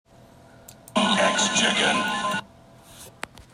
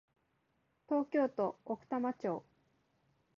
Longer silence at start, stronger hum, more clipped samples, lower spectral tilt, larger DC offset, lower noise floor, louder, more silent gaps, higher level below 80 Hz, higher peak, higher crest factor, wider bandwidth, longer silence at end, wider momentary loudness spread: second, 0.7 s vs 0.9 s; neither; neither; second, -2 dB/octave vs -6.5 dB/octave; neither; second, -51 dBFS vs -79 dBFS; first, -22 LUFS vs -37 LUFS; neither; first, -60 dBFS vs -82 dBFS; first, -8 dBFS vs -22 dBFS; about the same, 18 dB vs 16 dB; first, 16 kHz vs 7 kHz; second, 0.45 s vs 0.95 s; first, 19 LU vs 8 LU